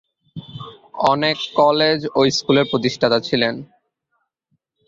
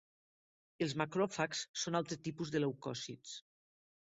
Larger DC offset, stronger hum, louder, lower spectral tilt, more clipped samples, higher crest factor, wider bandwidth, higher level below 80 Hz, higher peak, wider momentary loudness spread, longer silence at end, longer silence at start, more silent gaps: neither; neither; first, -17 LUFS vs -39 LUFS; about the same, -4.5 dB/octave vs -4 dB/octave; neither; about the same, 18 dB vs 22 dB; about the same, 7.8 kHz vs 8 kHz; first, -58 dBFS vs -76 dBFS; first, -2 dBFS vs -18 dBFS; first, 20 LU vs 11 LU; first, 1.25 s vs 0.75 s; second, 0.35 s vs 0.8 s; second, none vs 1.69-1.74 s